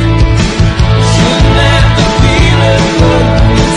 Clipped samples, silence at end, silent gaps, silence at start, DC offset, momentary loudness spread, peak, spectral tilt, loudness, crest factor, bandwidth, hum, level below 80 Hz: 0.4%; 0 s; none; 0 s; under 0.1%; 2 LU; 0 dBFS; -5.5 dB/octave; -8 LUFS; 6 dB; 10.5 kHz; none; -14 dBFS